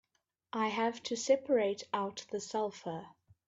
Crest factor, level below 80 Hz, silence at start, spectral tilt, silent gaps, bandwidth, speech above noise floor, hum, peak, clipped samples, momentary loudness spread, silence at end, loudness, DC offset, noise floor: 20 dB; -80 dBFS; 0.55 s; -3.5 dB/octave; none; 7.8 kHz; 48 dB; none; -16 dBFS; under 0.1%; 13 LU; 0.4 s; -35 LUFS; under 0.1%; -82 dBFS